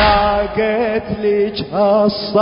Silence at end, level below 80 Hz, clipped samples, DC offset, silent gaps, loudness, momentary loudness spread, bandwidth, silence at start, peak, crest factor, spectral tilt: 0 s; -32 dBFS; under 0.1%; under 0.1%; none; -16 LUFS; 5 LU; 5.4 kHz; 0 s; 0 dBFS; 14 dB; -10 dB/octave